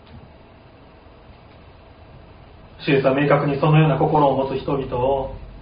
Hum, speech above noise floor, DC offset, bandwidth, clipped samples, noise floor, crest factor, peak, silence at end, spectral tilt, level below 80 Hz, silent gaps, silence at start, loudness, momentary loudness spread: none; 28 dB; under 0.1%; 5.2 kHz; under 0.1%; -46 dBFS; 18 dB; -2 dBFS; 0 s; -6.5 dB/octave; -44 dBFS; none; 0.15 s; -19 LUFS; 9 LU